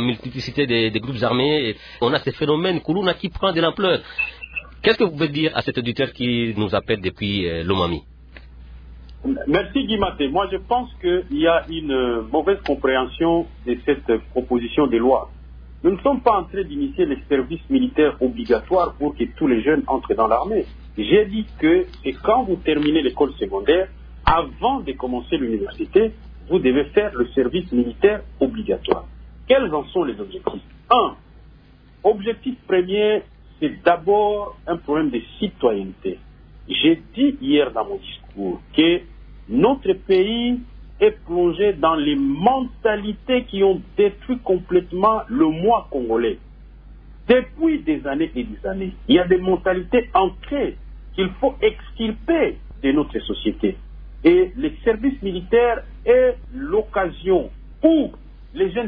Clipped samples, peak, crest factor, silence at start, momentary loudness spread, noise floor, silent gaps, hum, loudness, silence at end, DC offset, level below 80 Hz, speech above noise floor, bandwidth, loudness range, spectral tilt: under 0.1%; -2 dBFS; 18 dB; 0 s; 9 LU; -48 dBFS; none; none; -20 LUFS; 0 s; under 0.1%; -40 dBFS; 28 dB; 5.4 kHz; 3 LU; -8 dB/octave